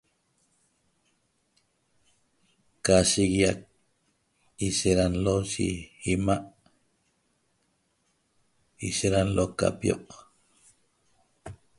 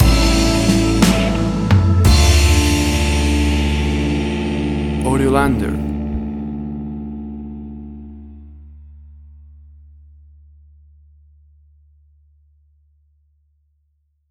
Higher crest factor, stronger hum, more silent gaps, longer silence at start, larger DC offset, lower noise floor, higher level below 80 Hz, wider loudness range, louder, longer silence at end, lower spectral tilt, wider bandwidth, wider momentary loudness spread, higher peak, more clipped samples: first, 24 dB vs 18 dB; neither; neither; first, 2.85 s vs 0 s; neither; first, -72 dBFS vs -65 dBFS; second, -48 dBFS vs -22 dBFS; second, 7 LU vs 20 LU; second, -26 LUFS vs -16 LUFS; second, 0.25 s vs 5.25 s; about the same, -4.5 dB/octave vs -5.5 dB/octave; second, 11.5 kHz vs 15.5 kHz; second, 13 LU vs 18 LU; second, -6 dBFS vs 0 dBFS; neither